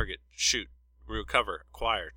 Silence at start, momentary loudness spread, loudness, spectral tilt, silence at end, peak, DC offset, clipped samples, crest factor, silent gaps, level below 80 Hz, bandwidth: 0 s; 12 LU; -30 LUFS; -1 dB/octave; 0 s; -8 dBFS; under 0.1%; under 0.1%; 24 dB; none; -46 dBFS; 16.5 kHz